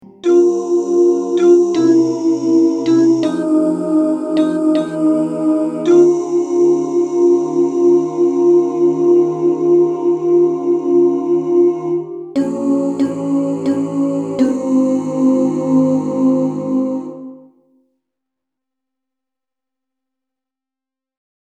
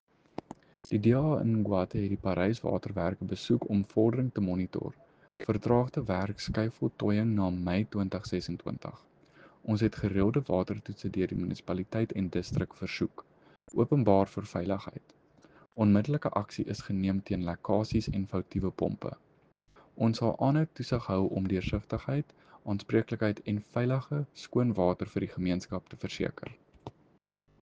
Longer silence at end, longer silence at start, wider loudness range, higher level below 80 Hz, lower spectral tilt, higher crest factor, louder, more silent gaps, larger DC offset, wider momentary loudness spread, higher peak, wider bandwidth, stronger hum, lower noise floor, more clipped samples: first, 4.15 s vs 0.7 s; second, 0.25 s vs 0.9 s; about the same, 4 LU vs 3 LU; second, -68 dBFS vs -54 dBFS; about the same, -7.5 dB/octave vs -8 dB/octave; second, 14 dB vs 22 dB; first, -15 LUFS vs -31 LUFS; neither; neither; second, 6 LU vs 13 LU; first, 0 dBFS vs -8 dBFS; about the same, 8.8 kHz vs 8 kHz; neither; first, -87 dBFS vs -68 dBFS; neither